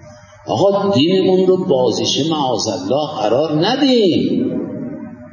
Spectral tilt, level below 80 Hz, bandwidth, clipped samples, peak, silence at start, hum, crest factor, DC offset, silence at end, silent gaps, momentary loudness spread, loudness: -5.5 dB/octave; -54 dBFS; 7.4 kHz; under 0.1%; -2 dBFS; 0.05 s; none; 14 dB; under 0.1%; 0 s; none; 11 LU; -15 LUFS